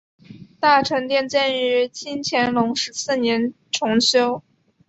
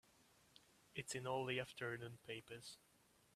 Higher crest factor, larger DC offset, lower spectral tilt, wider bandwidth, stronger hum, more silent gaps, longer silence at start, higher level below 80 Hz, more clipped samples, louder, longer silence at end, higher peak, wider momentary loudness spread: about the same, 18 dB vs 22 dB; neither; about the same, -3 dB/octave vs -4 dB/octave; second, 8.2 kHz vs 14.5 kHz; neither; neither; second, 0.3 s vs 0.55 s; first, -62 dBFS vs -80 dBFS; neither; first, -20 LUFS vs -48 LUFS; about the same, 0.5 s vs 0.6 s; first, -2 dBFS vs -28 dBFS; second, 8 LU vs 25 LU